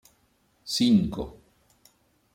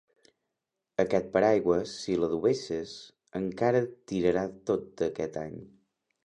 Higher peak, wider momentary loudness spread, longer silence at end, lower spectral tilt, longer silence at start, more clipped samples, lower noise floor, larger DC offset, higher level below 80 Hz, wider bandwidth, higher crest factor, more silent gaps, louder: about the same, -12 dBFS vs -10 dBFS; first, 19 LU vs 14 LU; first, 1.05 s vs 0.55 s; about the same, -5.5 dB/octave vs -6 dB/octave; second, 0.65 s vs 1 s; neither; second, -67 dBFS vs -86 dBFS; neither; first, -52 dBFS vs -60 dBFS; first, 16.5 kHz vs 10 kHz; about the same, 18 dB vs 20 dB; neither; first, -25 LUFS vs -29 LUFS